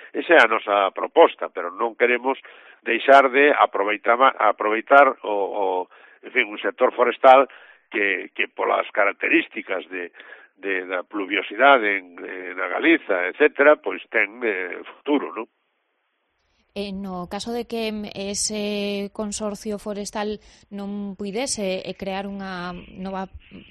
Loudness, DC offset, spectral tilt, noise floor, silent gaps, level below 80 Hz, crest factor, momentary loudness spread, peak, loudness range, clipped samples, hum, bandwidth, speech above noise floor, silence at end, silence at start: -21 LUFS; under 0.1%; -3.5 dB/octave; -72 dBFS; none; -58 dBFS; 22 dB; 17 LU; 0 dBFS; 11 LU; under 0.1%; none; 12.5 kHz; 51 dB; 0.1 s; 0 s